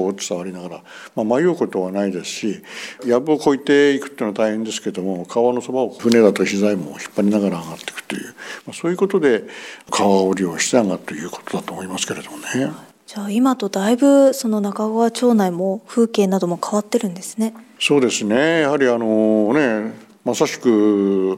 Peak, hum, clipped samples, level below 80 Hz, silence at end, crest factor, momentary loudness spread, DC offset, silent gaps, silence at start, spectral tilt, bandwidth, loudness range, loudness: 0 dBFS; none; under 0.1%; -66 dBFS; 0 s; 18 dB; 13 LU; under 0.1%; none; 0 s; -5 dB/octave; 16 kHz; 4 LU; -18 LUFS